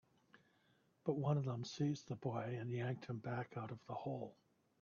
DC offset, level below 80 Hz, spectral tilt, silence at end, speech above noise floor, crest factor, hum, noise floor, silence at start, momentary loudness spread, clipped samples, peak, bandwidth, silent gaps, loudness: under 0.1%; -80 dBFS; -7 dB/octave; 0.5 s; 34 dB; 18 dB; none; -76 dBFS; 1.05 s; 9 LU; under 0.1%; -26 dBFS; 7 kHz; none; -44 LUFS